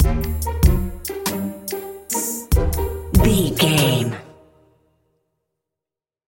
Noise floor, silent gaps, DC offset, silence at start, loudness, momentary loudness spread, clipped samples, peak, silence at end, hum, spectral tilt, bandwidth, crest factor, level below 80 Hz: -89 dBFS; none; under 0.1%; 0 s; -20 LUFS; 12 LU; under 0.1%; 0 dBFS; 1.95 s; none; -5 dB/octave; 17 kHz; 20 dB; -26 dBFS